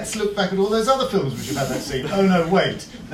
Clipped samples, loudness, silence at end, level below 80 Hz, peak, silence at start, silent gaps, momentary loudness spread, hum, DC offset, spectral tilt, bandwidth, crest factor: under 0.1%; -21 LUFS; 0 s; -46 dBFS; -6 dBFS; 0 s; none; 7 LU; none; under 0.1%; -5 dB/octave; 15.5 kHz; 16 dB